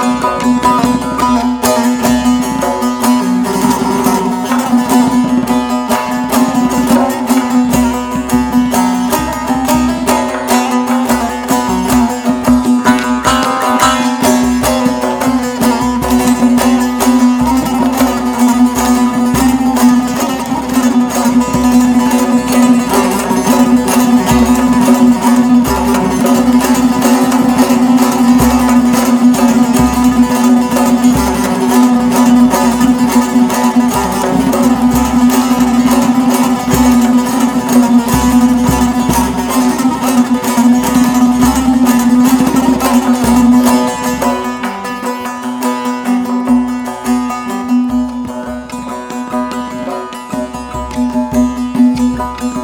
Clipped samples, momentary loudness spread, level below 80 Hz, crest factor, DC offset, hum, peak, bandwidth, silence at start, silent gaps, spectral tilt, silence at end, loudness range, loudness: 0.2%; 7 LU; -32 dBFS; 10 dB; under 0.1%; none; 0 dBFS; 19.5 kHz; 0 s; none; -4.5 dB/octave; 0 s; 6 LU; -11 LUFS